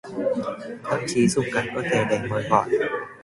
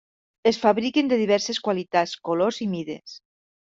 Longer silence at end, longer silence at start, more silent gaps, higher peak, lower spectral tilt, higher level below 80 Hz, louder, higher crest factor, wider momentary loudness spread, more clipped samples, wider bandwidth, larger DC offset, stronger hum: second, 0 s vs 0.45 s; second, 0.05 s vs 0.45 s; neither; about the same, -4 dBFS vs -6 dBFS; about the same, -5 dB/octave vs -4.5 dB/octave; first, -56 dBFS vs -66 dBFS; about the same, -24 LUFS vs -23 LUFS; about the same, 20 dB vs 18 dB; second, 7 LU vs 11 LU; neither; first, 11.5 kHz vs 7.8 kHz; neither; neither